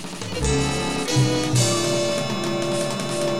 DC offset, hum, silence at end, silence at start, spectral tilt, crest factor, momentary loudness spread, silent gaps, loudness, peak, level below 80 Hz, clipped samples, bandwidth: 1%; none; 0 s; 0 s; -4.5 dB/octave; 18 dB; 5 LU; none; -22 LUFS; -4 dBFS; -38 dBFS; under 0.1%; 15.5 kHz